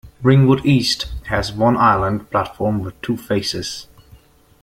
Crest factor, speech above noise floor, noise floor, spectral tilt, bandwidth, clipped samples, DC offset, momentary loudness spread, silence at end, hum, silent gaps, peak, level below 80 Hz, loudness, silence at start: 16 dB; 31 dB; -48 dBFS; -6 dB/octave; 15.5 kHz; under 0.1%; under 0.1%; 11 LU; 0.8 s; none; none; -2 dBFS; -40 dBFS; -18 LUFS; 0.05 s